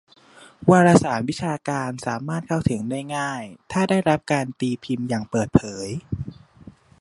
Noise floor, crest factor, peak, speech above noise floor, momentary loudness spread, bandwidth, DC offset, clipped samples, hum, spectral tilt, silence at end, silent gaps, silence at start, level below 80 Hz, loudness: -50 dBFS; 22 dB; 0 dBFS; 28 dB; 14 LU; 11.5 kHz; under 0.1%; under 0.1%; none; -6.5 dB/octave; 0.3 s; none; 0.4 s; -48 dBFS; -22 LUFS